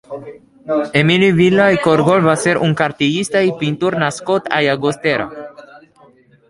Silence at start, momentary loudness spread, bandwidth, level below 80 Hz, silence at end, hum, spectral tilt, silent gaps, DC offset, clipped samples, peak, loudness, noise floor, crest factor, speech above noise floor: 0.1 s; 14 LU; 11.5 kHz; -54 dBFS; 0.7 s; none; -5.5 dB/octave; none; under 0.1%; under 0.1%; 0 dBFS; -15 LUFS; -49 dBFS; 16 dB; 34 dB